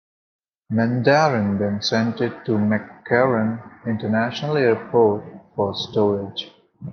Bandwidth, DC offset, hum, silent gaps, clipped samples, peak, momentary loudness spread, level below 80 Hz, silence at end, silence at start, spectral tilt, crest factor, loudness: 6.8 kHz; under 0.1%; none; none; under 0.1%; -4 dBFS; 12 LU; -64 dBFS; 0 s; 0.7 s; -6.5 dB/octave; 18 dB; -21 LUFS